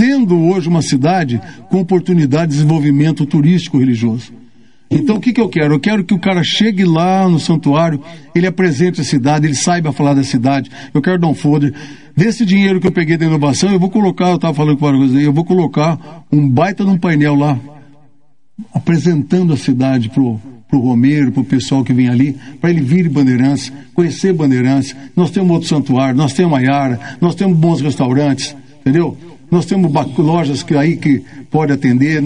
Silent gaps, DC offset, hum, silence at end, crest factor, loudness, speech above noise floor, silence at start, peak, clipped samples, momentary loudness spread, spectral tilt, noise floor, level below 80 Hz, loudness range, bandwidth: none; 0.8%; none; 0 s; 12 dB; -13 LUFS; 46 dB; 0 s; 0 dBFS; under 0.1%; 6 LU; -6.5 dB/octave; -58 dBFS; -50 dBFS; 2 LU; 10.5 kHz